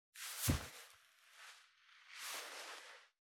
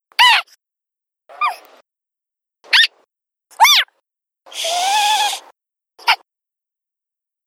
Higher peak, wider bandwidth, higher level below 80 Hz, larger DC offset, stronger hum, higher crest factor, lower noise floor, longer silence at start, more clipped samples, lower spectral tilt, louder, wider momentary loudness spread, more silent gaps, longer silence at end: second, -22 dBFS vs 0 dBFS; first, over 20 kHz vs 17.5 kHz; first, -58 dBFS vs -78 dBFS; neither; neither; first, 26 dB vs 20 dB; second, -67 dBFS vs -83 dBFS; about the same, 0.15 s vs 0.2 s; neither; first, -3.5 dB/octave vs 5 dB/octave; second, -44 LUFS vs -14 LUFS; first, 25 LU vs 14 LU; neither; second, 0.3 s vs 1.3 s